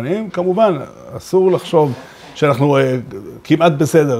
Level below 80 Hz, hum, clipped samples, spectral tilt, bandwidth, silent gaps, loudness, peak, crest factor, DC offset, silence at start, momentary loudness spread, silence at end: -54 dBFS; none; under 0.1%; -6.5 dB/octave; 16 kHz; none; -15 LUFS; 0 dBFS; 14 dB; under 0.1%; 0 s; 18 LU; 0 s